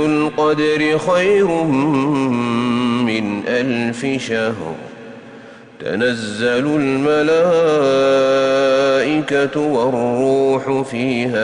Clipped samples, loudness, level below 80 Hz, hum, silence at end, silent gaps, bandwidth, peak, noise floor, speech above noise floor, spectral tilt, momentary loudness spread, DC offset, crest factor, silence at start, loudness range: under 0.1%; -16 LUFS; -54 dBFS; none; 0 s; none; 10.5 kHz; -6 dBFS; -38 dBFS; 23 dB; -5.5 dB/octave; 7 LU; under 0.1%; 10 dB; 0 s; 6 LU